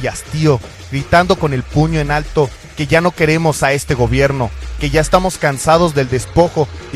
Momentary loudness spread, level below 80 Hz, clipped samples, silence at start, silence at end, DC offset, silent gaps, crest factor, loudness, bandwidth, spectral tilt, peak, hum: 8 LU; -28 dBFS; under 0.1%; 0 s; 0 s; under 0.1%; none; 14 dB; -15 LUFS; 14.5 kHz; -5.5 dB/octave; 0 dBFS; none